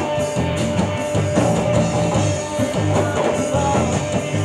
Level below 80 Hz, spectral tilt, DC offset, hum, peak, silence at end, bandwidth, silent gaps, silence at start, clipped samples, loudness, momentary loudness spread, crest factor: -38 dBFS; -5.5 dB/octave; under 0.1%; none; -4 dBFS; 0 s; 13.5 kHz; none; 0 s; under 0.1%; -19 LUFS; 3 LU; 14 dB